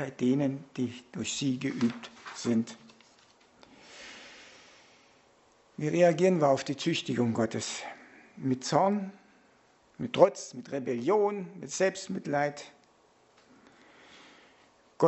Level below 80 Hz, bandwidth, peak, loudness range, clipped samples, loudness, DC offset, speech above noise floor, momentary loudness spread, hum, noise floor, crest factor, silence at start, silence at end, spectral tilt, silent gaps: -74 dBFS; 8.2 kHz; -6 dBFS; 10 LU; under 0.1%; -30 LUFS; under 0.1%; 35 dB; 22 LU; none; -64 dBFS; 26 dB; 0 s; 0 s; -5.5 dB/octave; none